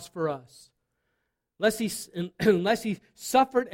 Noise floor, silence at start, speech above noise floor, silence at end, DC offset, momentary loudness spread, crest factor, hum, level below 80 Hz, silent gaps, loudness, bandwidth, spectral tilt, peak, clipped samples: -79 dBFS; 0 s; 52 dB; 0 s; under 0.1%; 12 LU; 18 dB; none; -62 dBFS; none; -27 LUFS; 16.5 kHz; -4.5 dB/octave; -10 dBFS; under 0.1%